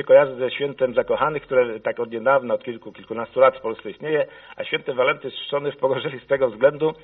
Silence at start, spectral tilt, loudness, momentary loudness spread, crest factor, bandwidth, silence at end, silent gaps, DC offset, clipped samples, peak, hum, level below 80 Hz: 0 s; -3 dB/octave; -22 LUFS; 12 LU; 18 dB; 4 kHz; 0.1 s; none; under 0.1%; under 0.1%; -2 dBFS; none; -62 dBFS